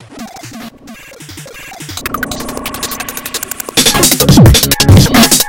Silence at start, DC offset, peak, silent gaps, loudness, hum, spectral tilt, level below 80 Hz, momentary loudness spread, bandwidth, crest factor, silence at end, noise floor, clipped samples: 0.1 s; under 0.1%; 0 dBFS; none; -9 LUFS; none; -4 dB/octave; -24 dBFS; 24 LU; over 20 kHz; 10 dB; 0 s; -33 dBFS; 2%